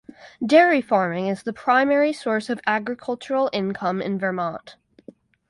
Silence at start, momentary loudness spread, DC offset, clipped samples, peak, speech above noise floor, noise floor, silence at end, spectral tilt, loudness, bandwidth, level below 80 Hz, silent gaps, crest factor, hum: 0.2 s; 12 LU; under 0.1%; under 0.1%; -2 dBFS; 27 dB; -48 dBFS; 0.75 s; -6 dB/octave; -22 LUFS; 11.5 kHz; -66 dBFS; none; 20 dB; none